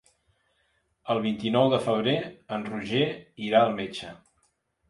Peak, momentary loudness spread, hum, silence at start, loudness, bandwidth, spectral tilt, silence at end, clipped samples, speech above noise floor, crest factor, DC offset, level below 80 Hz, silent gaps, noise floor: -8 dBFS; 13 LU; none; 1.05 s; -26 LUFS; 11.5 kHz; -6.5 dB/octave; 0.75 s; under 0.1%; 45 dB; 20 dB; under 0.1%; -64 dBFS; none; -71 dBFS